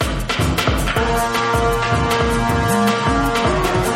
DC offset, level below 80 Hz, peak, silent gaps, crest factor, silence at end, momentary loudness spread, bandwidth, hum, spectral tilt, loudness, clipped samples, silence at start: under 0.1%; -26 dBFS; -4 dBFS; none; 14 dB; 0 s; 2 LU; 16.5 kHz; none; -5 dB/octave; -17 LUFS; under 0.1%; 0 s